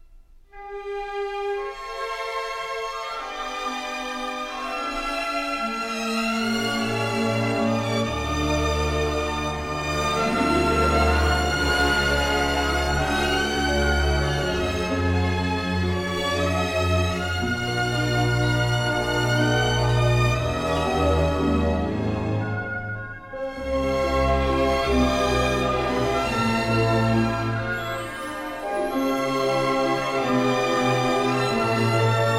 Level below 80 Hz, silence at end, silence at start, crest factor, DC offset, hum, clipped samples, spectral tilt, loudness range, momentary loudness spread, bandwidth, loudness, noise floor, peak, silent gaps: -34 dBFS; 0 s; 0.1 s; 16 dB; under 0.1%; none; under 0.1%; -5 dB/octave; 6 LU; 9 LU; 16 kHz; -23 LUFS; -49 dBFS; -8 dBFS; none